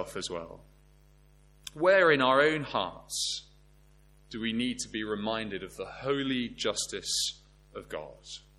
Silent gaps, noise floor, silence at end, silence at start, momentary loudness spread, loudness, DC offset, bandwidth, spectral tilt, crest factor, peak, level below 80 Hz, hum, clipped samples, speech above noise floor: none; -59 dBFS; 0.2 s; 0 s; 22 LU; -29 LUFS; under 0.1%; 16.5 kHz; -3 dB/octave; 22 dB; -10 dBFS; -58 dBFS; none; under 0.1%; 29 dB